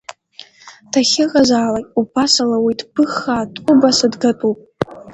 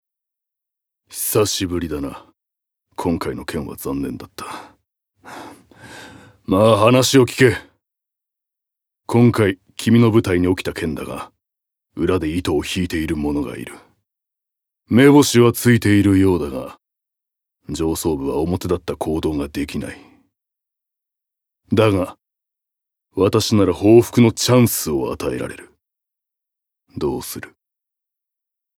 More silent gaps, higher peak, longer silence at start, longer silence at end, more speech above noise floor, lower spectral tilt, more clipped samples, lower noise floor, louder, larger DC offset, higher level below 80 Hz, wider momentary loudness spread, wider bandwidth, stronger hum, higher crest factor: neither; about the same, 0 dBFS vs 0 dBFS; second, 0.1 s vs 1.1 s; second, 0 s vs 1.3 s; second, 27 dB vs 67 dB; second, -3.5 dB/octave vs -5.5 dB/octave; neither; second, -42 dBFS vs -84 dBFS; about the same, -15 LUFS vs -17 LUFS; neither; second, -52 dBFS vs -44 dBFS; second, 8 LU vs 20 LU; second, 9 kHz vs 19 kHz; neither; about the same, 16 dB vs 18 dB